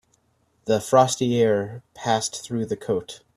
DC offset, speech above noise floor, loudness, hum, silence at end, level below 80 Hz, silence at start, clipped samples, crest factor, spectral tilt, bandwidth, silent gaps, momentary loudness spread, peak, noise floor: under 0.1%; 44 dB; -23 LUFS; none; 0.2 s; -62 dBFS; 0.65 s; under 0.1%; 20 dB; -4.5 dB/octave; 14.5 kHz; none; 12 LU; -2 dBFS; -66 dBFS